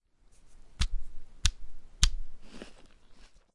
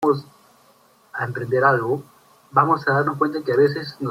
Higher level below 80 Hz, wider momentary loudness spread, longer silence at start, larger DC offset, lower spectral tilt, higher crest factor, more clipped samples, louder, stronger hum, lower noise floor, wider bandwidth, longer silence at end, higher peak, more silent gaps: first, -36 dBFS vs -64 dBFS; first, 23 LU vs 10 LU; first, 0.45 s vs 0 s; neither; second, -2 dB/octave vs -7.5 dB/octave; first, 30 dB vs 20 dB; neither; second, -33 LUFS vs -21 LUFS; neither; about the same, -57 dBFS vs -56 dBFS; second, 11.5 kHz vs 15.5 kHz; first, 0.3 s vs 0 s; about the same, -2 dBFS vs -2 dBFS; neither